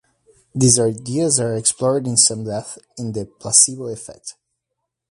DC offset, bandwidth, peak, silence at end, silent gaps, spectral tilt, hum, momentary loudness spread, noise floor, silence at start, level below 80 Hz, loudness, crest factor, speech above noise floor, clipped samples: under 0.1%; 11.5 kHz; 0 dBFS; 0.8 s; none; -3.5 dB/octave; none; 19 LU; -79 dBFS; 0.55 s; -54 dBFS; -16 LUFS; 20 dB; 60 dB; under 0.1%